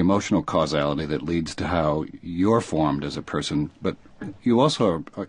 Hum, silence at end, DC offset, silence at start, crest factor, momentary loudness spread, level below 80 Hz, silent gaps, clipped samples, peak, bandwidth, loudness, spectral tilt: none; 0 s; under 0.1%; 0 s; 18 dB; 9 LU; -44 dBFS; none; under 0.1%; -4 dBFS; 10.5 kHz; -24 LUFS; -6 dB/octave